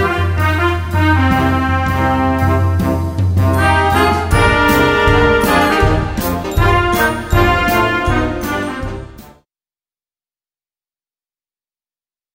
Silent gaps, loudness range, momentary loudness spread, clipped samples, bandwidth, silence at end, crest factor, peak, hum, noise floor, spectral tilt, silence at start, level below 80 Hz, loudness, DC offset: none; 9 LU; 7 LU; under 0.1%; 16.5 kHz; 3.05 s; 14 dB; 0 dBFS; none; under -90 dBFS; -6 dB/octave; 0 s; -26 dBFS; -14 LUFS; under 0.1%